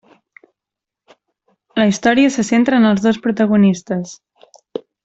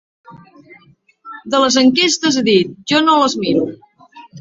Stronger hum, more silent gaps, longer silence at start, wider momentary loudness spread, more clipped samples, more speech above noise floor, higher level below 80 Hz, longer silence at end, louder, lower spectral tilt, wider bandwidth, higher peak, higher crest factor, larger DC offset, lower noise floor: neither; neither; first, 1.75 s vs 0.3 s; first, 18 LU vs 10 LU; neither; first, 71 dB vs 36 dB; about the same, -56 dBFS vs -58 dBFS; first, 0.25 s vs 0 s; about the same, -15 LUFS vs -14 LUFS; first, -5.5 dB/octave vs -3.5 dB/octave; about the same, 8 kHz vs 7.8 kHz; about the same, -2 dBFS vs -2 dBFS; about the same, 14 dB vs 16 dB; neither; first, -85 dBFS vs -50 dBFS